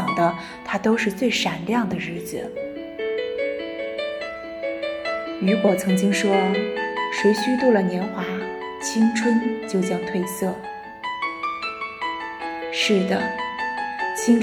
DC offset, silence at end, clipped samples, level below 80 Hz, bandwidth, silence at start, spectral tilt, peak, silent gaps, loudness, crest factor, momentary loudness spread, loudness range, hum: under 0.1%; 0 s; under 0.1%; -60 dBFS; 17 kHz; 0 s; -5 dB/octave; -6 dBFS; none; -23 LUFS; 18 dB; 11 LU; 6 LU; none